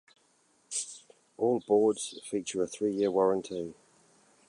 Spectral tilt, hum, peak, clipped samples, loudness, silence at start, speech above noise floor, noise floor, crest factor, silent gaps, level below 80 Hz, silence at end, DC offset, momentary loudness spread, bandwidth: -4.5 dB/octave; none; -14 dBFS; under 0.1%; -30 LUFS; 0.7 s; 39 dB; -68 dBFS; 18 dB; none; -72 dBFS; 0.75 s; under 0.1%; 13 LU; 11.5 kHz